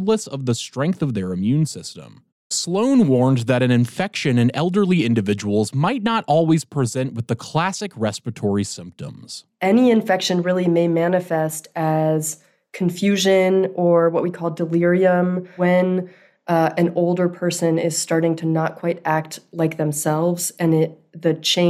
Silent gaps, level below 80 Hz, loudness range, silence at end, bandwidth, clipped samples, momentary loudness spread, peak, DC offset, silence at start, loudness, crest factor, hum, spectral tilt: 2.32-2.50 s; -64 dBFS; 3 LU; 0 s; 15 kHz; under 0.1%; 9 LU; -6 dBFS; under 0.1%; 0 s; -20 LUFS; 14 dB; none; -5.5 dB/octave